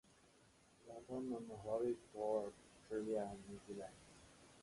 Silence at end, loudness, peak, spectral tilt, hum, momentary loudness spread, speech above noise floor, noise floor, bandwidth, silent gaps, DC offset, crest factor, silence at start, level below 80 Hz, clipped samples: 0 s; -46 LUFS; -28 dBFS; -6.5 dB/octave; none; 21 LU; 26 dB; -71 dBFS; 11.5 kHz; none; under 0.1%; 18 dB; 0.8 s; -74 dBFS; under 0.1%